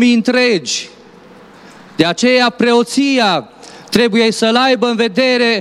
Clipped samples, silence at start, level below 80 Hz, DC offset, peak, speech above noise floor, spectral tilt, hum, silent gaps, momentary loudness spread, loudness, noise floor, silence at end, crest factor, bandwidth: under 0.1%; 0 s; -56 dBFS; under 0.1%; 0 dBFS; 27 dB; -3.5 dB/octave; none; none; 8 LU; -13 LUFS; -40 dBFS; 0 s; 14 dB; 14.5 kHz